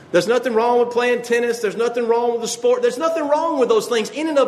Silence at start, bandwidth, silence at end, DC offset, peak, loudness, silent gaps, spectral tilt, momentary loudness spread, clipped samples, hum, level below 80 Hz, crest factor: 0 s; 13.5 kHz; 0 s; under 0.1%; -2 dBFS; -19 LUFS; none; -3.5 dB/octave; 4 LU; under 0.1%; none; -72 dBFS; 16 dB